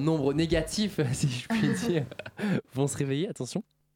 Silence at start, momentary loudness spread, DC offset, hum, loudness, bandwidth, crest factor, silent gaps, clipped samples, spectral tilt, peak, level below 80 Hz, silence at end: 0 s; 8 LU; under 0.1%; none; -29 LUFS; 17 kHz; 16 dB; none; under 0.1%; -5.5 dB/octave; -14 dBFS; -50 dBFS; 0.35 s